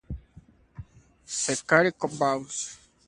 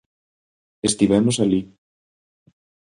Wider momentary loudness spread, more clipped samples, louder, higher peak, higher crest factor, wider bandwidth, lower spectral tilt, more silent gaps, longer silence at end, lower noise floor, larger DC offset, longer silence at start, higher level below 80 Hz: first, 25 LU vs 7 LU; neither; second, -26 LUFS vs -19 LUFS; about the same, -4 dBFS vs -4 dBFS; first, 26 dB vs 20 dB; about the same, 11.5 kHz vs 11 kHz; second, -3.5 dB/octave vs -5 dB/octave; neither; second, 0.35 s vs 1.25 s; second, -55 dBFS vs under -90 dBFS; neither; second, 0.1 s vs 0.85 s; about the same, -50 dBFS vs -52 dBFS